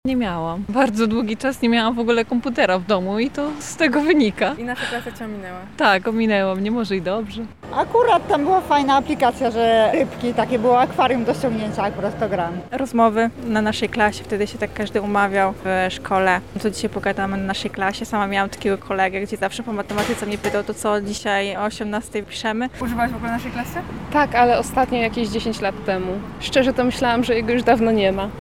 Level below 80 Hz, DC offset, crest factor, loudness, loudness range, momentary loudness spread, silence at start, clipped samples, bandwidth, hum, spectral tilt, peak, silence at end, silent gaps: -44 dBFS; 0.5%; 18 dB; -20 LUFS; 4 LU; 9 LU; 0.05 s; under 0.1%; 16 kHz; none; -5 dB/octave; -2 dBFS; 0 s; none